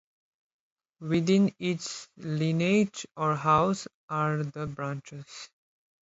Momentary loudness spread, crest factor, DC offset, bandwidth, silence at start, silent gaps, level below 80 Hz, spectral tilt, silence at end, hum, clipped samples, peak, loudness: 18 LU; 18 dB; under 0.1%; 8 kHz; 1 s; 3.94-4.08 s; -62 dBFS; -6 dB/octave; 0.55 s; none; under 0.1%; -10 dBFS; -28 LUFS